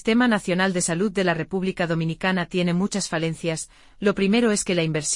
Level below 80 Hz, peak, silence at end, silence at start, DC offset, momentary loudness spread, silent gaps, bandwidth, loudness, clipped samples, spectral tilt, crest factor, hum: -52 dBFS; -6 dBFS; 0 s; 0.05 s; under 0.1%; 6 LU; none; 11.5 kHz; -23 LUFS; under 0.1%; -4.5 dB/octave; 16 dB; none